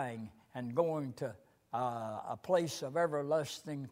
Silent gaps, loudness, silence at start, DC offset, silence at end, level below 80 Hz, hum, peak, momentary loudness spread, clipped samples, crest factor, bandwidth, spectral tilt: none; -37 LUFS; 0 s; under 0.1%; 0 s; -78 dBFS; none; -18 dBFS; 10 LU; under 0.1%; 18 dB; 16 kHz; -5.5 dB/octave